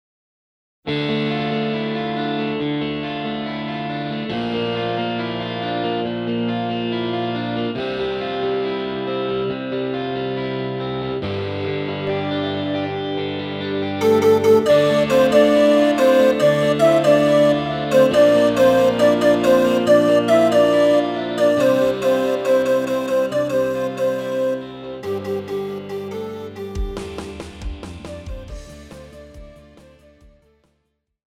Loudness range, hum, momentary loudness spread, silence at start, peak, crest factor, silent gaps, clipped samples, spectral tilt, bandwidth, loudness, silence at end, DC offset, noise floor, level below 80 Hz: 14 LU; none; 15 LU; 0.85 s; -2 dBFS; 16 dB; none; under 0.1%; -6 dB/octave; 16 kHz; -19 LUFS; 1.8 s; under 0.1%; -71 dBFS; -44 dBFS